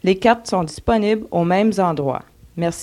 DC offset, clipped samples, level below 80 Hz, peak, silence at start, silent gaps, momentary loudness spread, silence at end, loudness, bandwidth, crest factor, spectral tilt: under 0.1%; under 0.1%; -42 dBFS; -2 dBFS; 0.05 s; none; 8 LU; 0 s; -19 LUFS; 14 kHz; 16 dB; -6 dB/octave